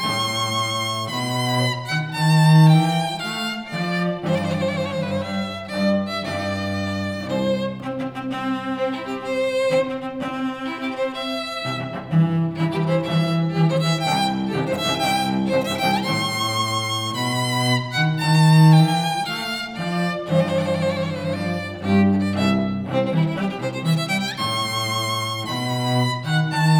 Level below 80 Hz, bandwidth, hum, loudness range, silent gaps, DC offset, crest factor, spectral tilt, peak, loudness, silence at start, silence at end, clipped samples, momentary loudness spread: -56 dBFS; 18 kHz; none; 6 LU; none; under 0.1%; 16 dB; -5.5 dB/octave; -4 dBFS; -21 LUFS; 0 s; 0 s; under 0.1%; 9 LU